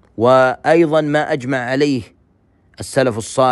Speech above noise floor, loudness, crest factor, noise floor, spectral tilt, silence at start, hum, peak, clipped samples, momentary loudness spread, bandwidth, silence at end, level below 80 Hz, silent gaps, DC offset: 41 dB; -16 LUFS; 16 dB; -56 dBFS; -5.5 dB/octave; 0.2 s; none; 0 dBFS; under 0.1%; 8 LU; 12.5 kHz; 0 s; -54 dBFS; none; under 0.1%